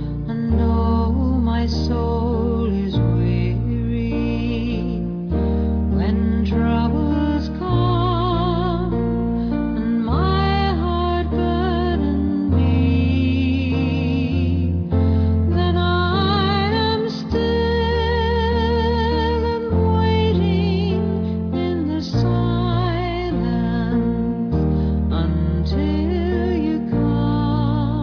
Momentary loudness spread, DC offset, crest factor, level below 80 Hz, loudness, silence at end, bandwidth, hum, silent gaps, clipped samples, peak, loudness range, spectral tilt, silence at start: 4 LU; under 0.1%; 12 dB; -26 dBFS; -20 LUFS; 0 s; 5.4 kHz; none; none; under 0.1%; -6 dBFS; 2 LU; -8.5 dB/octave; 0 s